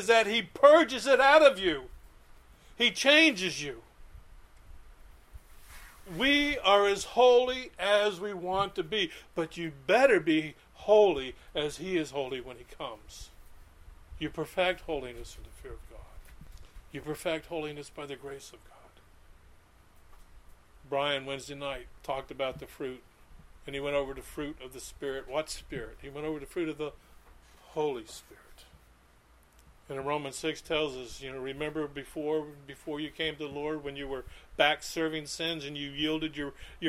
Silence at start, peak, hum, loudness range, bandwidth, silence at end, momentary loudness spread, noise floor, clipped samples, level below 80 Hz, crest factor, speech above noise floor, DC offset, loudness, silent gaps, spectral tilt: 0 s; -6 dBFS; none; 14 LU; 15.5 kHz; 0 s; 21 LU; -61 dBFS; under 0.1%; -54 dBFS; 24 dB; 31 dB; under 0.1%; -29 LUFS; none; -3.5 dB/octave